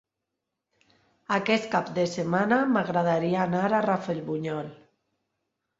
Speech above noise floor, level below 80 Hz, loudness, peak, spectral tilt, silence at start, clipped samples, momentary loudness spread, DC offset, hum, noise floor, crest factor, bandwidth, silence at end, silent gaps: 59 dB; -68 dBFS; -26 LUFS; -8 dBFS; -6.5 dB/octave; 1.3 s; under 0.1%; 8 LU; under 0.1%; none; -84 dBFS; 20 dB; 7.8 kHz; 1.05 s; none